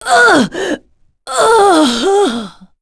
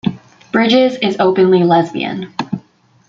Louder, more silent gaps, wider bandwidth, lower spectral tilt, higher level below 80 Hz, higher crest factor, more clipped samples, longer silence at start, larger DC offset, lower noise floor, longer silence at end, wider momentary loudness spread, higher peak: first, -11 LUFS vs -14 LUFS; neither; first, 11 kHz vs 7.6 kHz; second, -3 dB/octave vs -6.5 dB/octave; first, -46 dBFS vs -56 dBFS; about the same, 12 dB vs 14 dB; neither; about the same, 0 s vs 0.05 s; neither; about the same, -47 dBFS vs -47 dBFS; second, 0.3 s vs 0.5 s; first, 15 LU vs 12 LU; about the same, 0 dBFS vs 0 dBFS